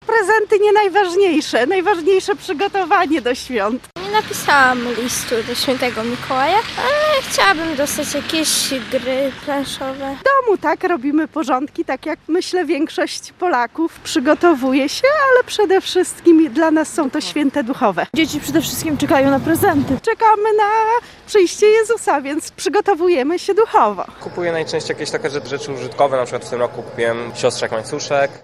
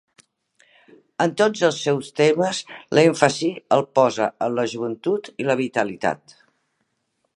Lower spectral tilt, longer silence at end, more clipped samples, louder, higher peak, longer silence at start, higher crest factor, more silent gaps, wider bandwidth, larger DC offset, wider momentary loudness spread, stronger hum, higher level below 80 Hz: second, -3.5 dB/octave vs -5 dB/octave; second, 0.05 s vs 1.25 s; neither; first, -17 LUFS vs -21 LUFS; about the same, 0 dBFS vs 0 dBFS; second, 0.05 s vs 1.2 s; second, 16 dB vs 22 dB; neither; first, 15.5 kHz vs 11.5 kHz; neither; about the same, 9 LU vs 8 LU; neither; first, -52 dBFS vs -68 dBFS